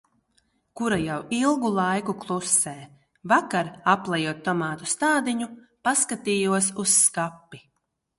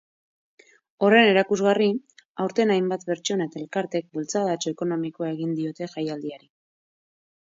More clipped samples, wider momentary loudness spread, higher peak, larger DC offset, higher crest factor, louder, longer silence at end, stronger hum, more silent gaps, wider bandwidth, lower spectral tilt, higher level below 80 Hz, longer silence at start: neither; about the same, 10 LU vs 12 LU; about the same, -6 dBFS vs -4 dBFS; neither; about the same, 20 dB vs 20 dB; about the same, -23 LUFS vs -24 LUFS; second, 0.6 s vs 1.05 s; neither; second, none vs 2.25-2.35 s; first, 12 kHz vs 7.8 kHz; second, -3 dB/octave vs -5 dB/octave; first, -62 dBFS vs -74 dBFS; second, 0.75 s vs 1 s